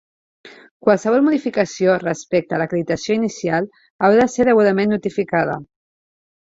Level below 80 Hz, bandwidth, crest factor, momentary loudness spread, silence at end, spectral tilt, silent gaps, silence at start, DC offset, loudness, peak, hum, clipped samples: -56 dBFS; 7.8 kHz; 16 dB; 7 LU; 0.85 s; -6 dB/octave; 0.71-0.80 s, 3.90-3.99 s; 0.45 s; under 0.1%; -18 LUFS; -2 dBFS; none; under 0.1%